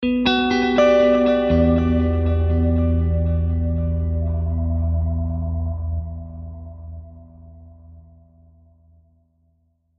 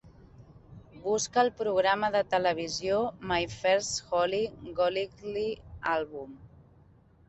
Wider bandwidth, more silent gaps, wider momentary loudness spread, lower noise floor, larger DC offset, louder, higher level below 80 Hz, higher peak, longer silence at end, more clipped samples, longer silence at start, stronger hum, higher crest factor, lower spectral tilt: second, 6.2 kHz vs 8.4 kHz; neither; first, 19 LU vs 9 LU; first, -64 dBFS vs -59 dBFS; neither; first, -20 LUFS vs -29 LUFS; first, -28 dBFS vs -58 dBFS; first, -4 dBFS vs -12 dBFS; first, 2 s vs 0.8 s; neither; about the same, 0 s vs 0.05 s; neither; about the same, 16 dB vs 18 dB; first, -8 dB/octave vs -3 dB/octave